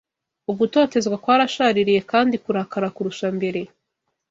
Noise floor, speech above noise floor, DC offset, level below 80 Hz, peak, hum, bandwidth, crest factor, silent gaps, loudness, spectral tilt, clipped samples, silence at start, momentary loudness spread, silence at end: -77 dBFS; 57 dB; under 0.1%; -64 dBFS; -4 dBFS; none; 7.8 kHz; 18 dB; none; -20 LUFS; -5 dB/octave; under 0.1%; 0.5 s; 10 LU; 0.65 s